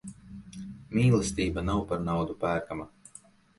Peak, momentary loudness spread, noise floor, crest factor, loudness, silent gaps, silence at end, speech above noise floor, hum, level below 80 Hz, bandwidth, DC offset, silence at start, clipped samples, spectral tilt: -12 dBFS; 21 LU; -55 dBFS; 18 dB; -29 LUFS; none; 0.7 s; 27 dB; none; -46 dBFS; 11.5 kHz; under 0.1%; 0.05 s; under 0.1%; -6.5 dB/octave